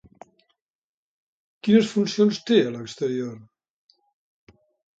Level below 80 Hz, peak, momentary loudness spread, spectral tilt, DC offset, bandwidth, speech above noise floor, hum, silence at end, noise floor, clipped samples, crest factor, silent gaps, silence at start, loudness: -68 dBFS; -6 dBFS; 11 LU; -6 dB/octave; under 0.1%; 8 kHz; over 69 dB; none; 1.6 s; under -90 dBFS; under 0.1%; 20 dB; none; 1.65 s; -22 LUFS